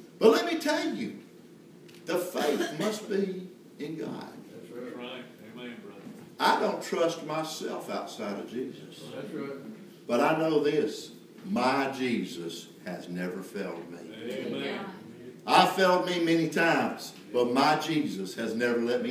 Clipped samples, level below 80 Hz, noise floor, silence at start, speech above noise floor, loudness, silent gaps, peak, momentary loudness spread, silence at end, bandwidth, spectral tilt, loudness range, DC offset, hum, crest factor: under 0.1%; -82 dBFS; -52 dBFS; 0 s; 22 dB; -29 LUFS; none; -8 dBFS; 19 LU; 0 s; 16 kHz; -4.5 dB/octave; 9 LU; under 0.1%; none; 22 dB